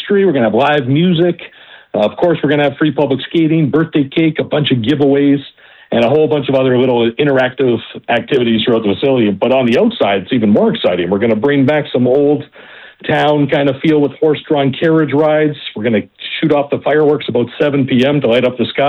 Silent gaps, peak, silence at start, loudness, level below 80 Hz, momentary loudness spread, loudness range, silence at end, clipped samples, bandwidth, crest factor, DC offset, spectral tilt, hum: none; -2 dBFS; 0 s; -13 LUFS; -54 dBFS; 5 LU; 1 LU; 0 s; under 0.1%; 6.6 kHz; 10 dB; under 0.1%; -8.5 dB/octave; none